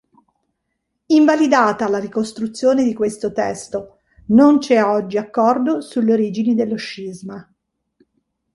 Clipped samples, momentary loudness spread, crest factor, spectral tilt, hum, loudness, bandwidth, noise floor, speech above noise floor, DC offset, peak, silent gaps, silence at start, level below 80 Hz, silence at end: under 0.1%; 16 LU; 16 dB; -5.5 dB/octave; none; -17 LUFS; 11.5 kHz; -74 dBFS; 58 dB; under 0.1%; -2 dBFS; none; 1.1 s; -58 dBFS; 1.1 s